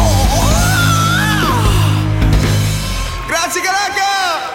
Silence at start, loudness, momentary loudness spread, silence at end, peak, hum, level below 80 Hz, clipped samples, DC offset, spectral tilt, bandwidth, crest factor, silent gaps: 0 s; -13 LUFS; 5 LU; 0 s; 0 dBFS; none; -20 dBFS; under 0.1%; under 0.1%; -4 dB/octave; 17 kHz; 12 dB; none